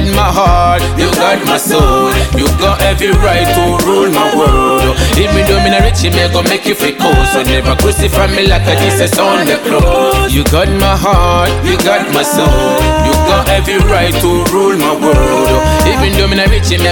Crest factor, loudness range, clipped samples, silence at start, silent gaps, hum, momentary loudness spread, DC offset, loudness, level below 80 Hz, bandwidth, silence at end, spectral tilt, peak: 8 dB; 1 LU; under 0.1%; 0 s; none; none; 2 LU; under 0.1%; -9 LUFS; -16 dBFS; 17.5 kHz; 0 s; -4.5 dB/octave; 0 dBFS